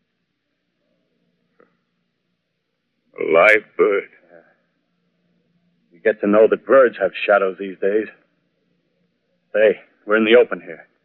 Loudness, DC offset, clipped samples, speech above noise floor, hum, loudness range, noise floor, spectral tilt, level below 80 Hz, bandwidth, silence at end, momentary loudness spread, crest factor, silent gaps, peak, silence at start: -17 LUFS; under 0.1%; under 0.1%; 58 dB; none; 3 LU; -74 dBFS; -2.5 dB/octave; -70 dBFS; 6.4 kHz; 0.3 s; 12 LU; 20 dB; none; 0 dBFS; 3.2 s